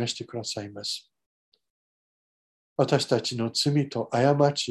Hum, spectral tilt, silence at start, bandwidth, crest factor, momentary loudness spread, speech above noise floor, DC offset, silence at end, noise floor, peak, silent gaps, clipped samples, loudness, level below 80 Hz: none; -5 dB/octave; 0 s; 12.5 kHz; 22 dB; 11 LU; over 64 dB; under 0.1%; 0 s; under -90 dBFS; -6 dBFS; 1.26-1.52 s, 1.70-2.76 s; under 0.1%; -26 LUFS; -68 dBFS